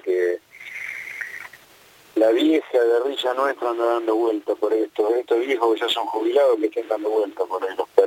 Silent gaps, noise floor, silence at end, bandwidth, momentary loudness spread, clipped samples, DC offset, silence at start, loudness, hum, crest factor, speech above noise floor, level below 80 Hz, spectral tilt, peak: none; -51 dBFS; 0 s; 17 kHz; 12 LU; under 0.1%; under 0.1%; 0.05 s; -22 LUFS; none; 20 dB; 30 dB; -74 dBFS; -3 dB/octave; -2 dBFS